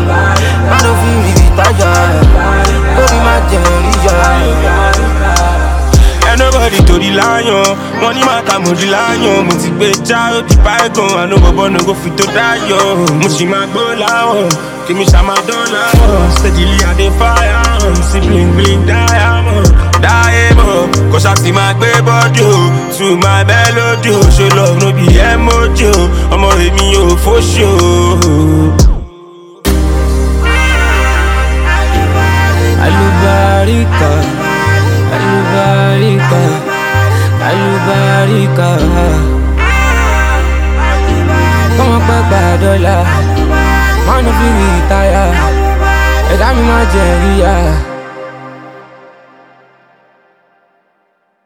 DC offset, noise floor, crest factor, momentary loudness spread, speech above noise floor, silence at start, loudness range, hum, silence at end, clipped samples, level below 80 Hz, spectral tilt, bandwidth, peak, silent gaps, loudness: under 0.1%; -58 dBFS; 8 dB; 4 LU; 50 dB; 0 s; 2 LU; none; 2.65 s; 2%; -12 dBFS; -5 dB/octave; 16.5 kHz; 0 dBFS; none; -9 LUFS